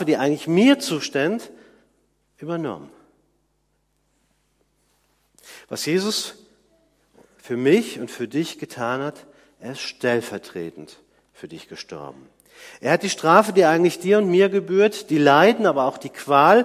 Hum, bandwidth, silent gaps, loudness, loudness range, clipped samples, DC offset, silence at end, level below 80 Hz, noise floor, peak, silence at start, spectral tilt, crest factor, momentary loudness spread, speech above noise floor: none; 15.5 kHz; none; -20 LUFS; 19 LU; under 0.1%; under 0.1%; 0 s; -70 dBFS; -69 dBFS; 0 dBFS; 0 s; -5 dB/octave; 22 dB; 20 LU; 49 dB